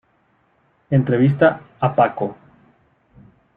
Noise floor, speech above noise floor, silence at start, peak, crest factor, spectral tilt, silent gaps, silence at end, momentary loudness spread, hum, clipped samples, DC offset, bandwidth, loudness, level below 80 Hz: -62 dBFS; 45 dB; 0.9 s; -2 dBFS; 18 dB; -11 dB/octave; none; 1.25 s; 10 LU; none; under 0.1%; under 0.1%; 3.9 kHz; -18 LUFS; -56 dBFS